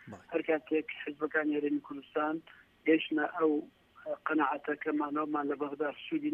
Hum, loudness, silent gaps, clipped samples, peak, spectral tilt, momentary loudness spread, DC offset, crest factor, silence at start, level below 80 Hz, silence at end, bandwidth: none; -33 LUFS; none; under 0.1%; -16 dBFS; -7 dB/octave; 8 LU; under 0.1%; 18 dB; 0.05 s; -78 dBFS; 0 s; 3.7 kHz